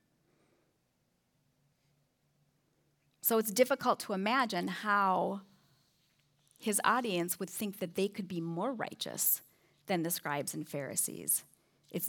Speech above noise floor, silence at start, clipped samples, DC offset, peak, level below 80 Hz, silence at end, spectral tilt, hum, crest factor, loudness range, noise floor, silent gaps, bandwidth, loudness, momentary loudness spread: 44 dB; 3.25 s; under 0.1%; under 0.1%; -12 dBFS; -88 dBFS; 0 s; -3.5 dB/octave; none; 22 dB; 4 LU; -77 dBFS; none; over 20 kHz; -33 LUFS; 9 LU